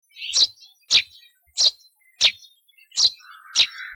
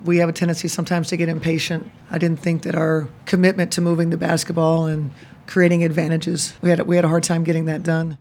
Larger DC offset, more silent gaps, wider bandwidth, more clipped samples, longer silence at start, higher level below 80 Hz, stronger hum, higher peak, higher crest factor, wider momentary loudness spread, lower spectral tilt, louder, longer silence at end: neither; neither; about the same, 17 kHz vs 16.5 kHz; neither; first, 0.2 s vs 0 s; about the same, -62 dBFS vs -58 dBFS; neither; second, -8 dBFS vs -4 dBFS; about the same, 16 dB vs 16 dB; about the same, 7 LU vs 6 LU; second, 3 dB/octave vs -6 dB/octave; about the same, -19 LUFS vs -20 LUFS; about the same, 0 s vs 0.05 s